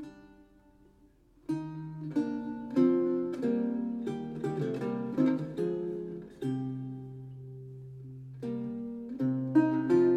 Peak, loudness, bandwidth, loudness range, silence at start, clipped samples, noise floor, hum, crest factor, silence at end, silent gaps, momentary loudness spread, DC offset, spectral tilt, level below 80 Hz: -12 dBFS; -32 LUFS; 9 kHz; 7 LU; 0 s; under 0.1%; -62 dBFS; none; 20 dB; 0 s; none; 19 LU; under 0.1%; -9 dB/octave; -66 dBFS